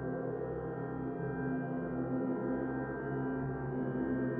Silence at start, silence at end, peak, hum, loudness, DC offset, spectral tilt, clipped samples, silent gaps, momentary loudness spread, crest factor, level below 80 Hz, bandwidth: 0 s; 0 s; -24 dBFS; none; -37 LUFS; under 0.1%; -10 dB/octave; under 0.1%; none; 4 LU; 12 dB; -58 dBFS; 3.4 kHz